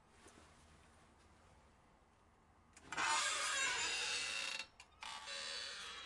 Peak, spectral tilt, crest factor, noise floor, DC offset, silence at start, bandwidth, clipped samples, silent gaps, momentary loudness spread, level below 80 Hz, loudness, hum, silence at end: -24 dBFS; 1 dB/octave; 20 dB; -70 dBFS; under 0.1%; 0.15 s; 11.5 kHz; under 0.1%; none; 13 LU; -74 dBFS; -40 LUFS; none; 0 s